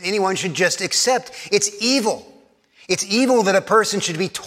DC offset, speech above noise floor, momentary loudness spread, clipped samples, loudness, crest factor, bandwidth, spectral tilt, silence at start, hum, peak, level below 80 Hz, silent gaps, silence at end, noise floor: under 0.1%; 33 dB; 7 LU; under 0.1%; -18 LUFS; 18 dB; 16.5 kHz; -2.5 dB/octave; 0 s; none; -2 dBFS; -68 dBFS; none; 0 s; -53 dBFS